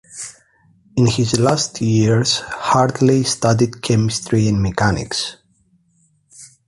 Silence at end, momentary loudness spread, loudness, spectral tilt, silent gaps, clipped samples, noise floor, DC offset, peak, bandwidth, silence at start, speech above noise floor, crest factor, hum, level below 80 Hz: 0.2 s; 8 LU; -17 LUFS; -5 dB/octave; none; under 0.1%; -60 dBFS; under 0.1%; -2 dBFS; 11.5 kHz; 0.1 s; 44 dB; 16 dB; none; -42 dBFS